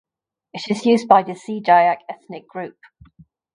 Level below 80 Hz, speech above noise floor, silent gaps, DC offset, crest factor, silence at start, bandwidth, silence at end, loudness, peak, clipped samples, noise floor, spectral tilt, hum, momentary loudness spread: -64 dBFS; 34 dB; none; under 0.1%; 20 dB; 0.55 s; 10.5 kHz; 0.85 s; -17 LUFS; 0 dBFS; under 0.1%; -52 dBFS; -5.5 dB/octave; none; 20 LU